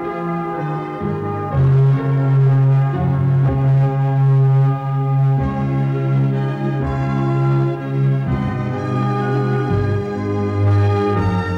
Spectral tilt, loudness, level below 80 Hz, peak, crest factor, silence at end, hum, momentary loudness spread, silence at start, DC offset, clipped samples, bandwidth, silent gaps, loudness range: -10 dB/octave; -17 LUFS; -38 dBFS; -10 dBFS; 6 dB; 0 s; none; 8 LU; 0 s; under 0.1%; under 0.1%; 5 kHz; none; 4 LU